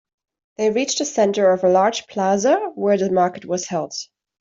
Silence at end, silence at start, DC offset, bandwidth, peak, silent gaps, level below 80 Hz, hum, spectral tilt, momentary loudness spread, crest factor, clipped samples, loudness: 0.35 s; 0.6 s; under 0.1%; 7.8 kHz; -4 dBFS; none; -64 dBFS; none; -4 dB/octave; 9 LU; 16 dB; under 0.1%; -19 LUFS